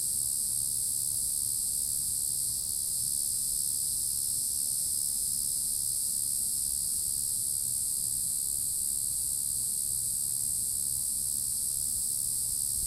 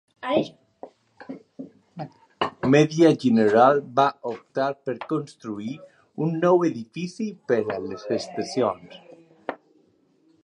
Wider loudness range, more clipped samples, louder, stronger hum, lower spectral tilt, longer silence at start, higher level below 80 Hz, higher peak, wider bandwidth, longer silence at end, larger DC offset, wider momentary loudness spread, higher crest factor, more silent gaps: second, 0 LU vs 8 LU; neither; second, -28 LUFS vs -23 LUFS; neither; second, 0 dB/octave vs -6.5 dB/octave; second, 0 s vs 0.2 s; first, -56 dBFS vs -68 dBFS; second, -14 dBFS vs -4 dBFS; first, 16 kHz vs 10.5 kHz; second, 0 s vs 0.9 s; neither; second, 1 LU vs 22 LU; about the same, 18 dB vs 20 dB; neither